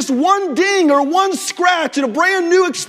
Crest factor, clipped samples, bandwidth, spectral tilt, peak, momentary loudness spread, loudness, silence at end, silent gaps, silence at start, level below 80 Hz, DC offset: 14 dB; under 0.1%; 16 kHz; -2 dB/octave; 0 dBFS; 4 LU; -14 LUFS; 0 s; none; 0 s; -68 dBFS; under 0.1%